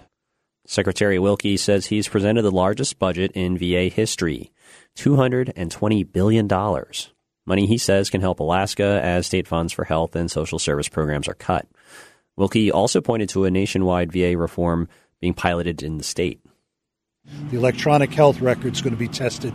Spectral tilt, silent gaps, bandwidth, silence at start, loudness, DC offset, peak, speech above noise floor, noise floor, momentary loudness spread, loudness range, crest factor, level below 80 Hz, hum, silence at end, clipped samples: -5.5 dB/octave; none; 13.5 kHz; 0.7 s; -21 LUFS; under 0.1%; -2 dBFS; 61 dB; -81 dBFS; 8 LU; 3 LU; 20 dB; -44 dBFS; none; 0 s; under 0.1%